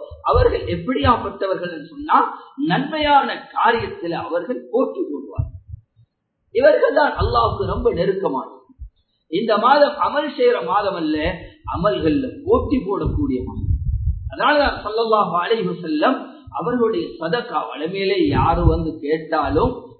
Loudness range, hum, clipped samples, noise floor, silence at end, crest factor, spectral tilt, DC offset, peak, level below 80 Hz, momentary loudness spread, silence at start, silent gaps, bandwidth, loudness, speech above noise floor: 2 LU; none; under 0.1%; -63 dBFS; 0.1 s; 18 dB; -11.5 dB/octave; under 0.1%; -2 dBFS; -32 dBFS; 10 LU; 0 s; none; 4.6 kHz; -19 LUFS; 44 dB